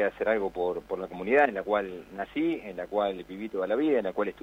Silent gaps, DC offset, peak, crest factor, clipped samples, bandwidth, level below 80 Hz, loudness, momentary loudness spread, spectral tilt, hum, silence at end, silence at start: none; under 0.1%; -10 dBFS; 18 dB; under 0.1%; 16 kHz; -60 dBFS; -29 LUFS; 12 LU; -7 dB/octave; none; 0 s; 0 s